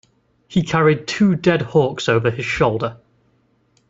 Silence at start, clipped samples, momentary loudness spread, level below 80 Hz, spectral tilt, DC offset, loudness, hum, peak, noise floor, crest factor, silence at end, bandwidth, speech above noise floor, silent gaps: 0.5 s; under 0.1%; 7 LU; -48 dBFS; -6.5 dB/octave; under 0.1%; -18 LUFS; none; -2 dBFS; -61 dBFS; 16 dB; 0.95 s; 8 kHz; 44 dB; none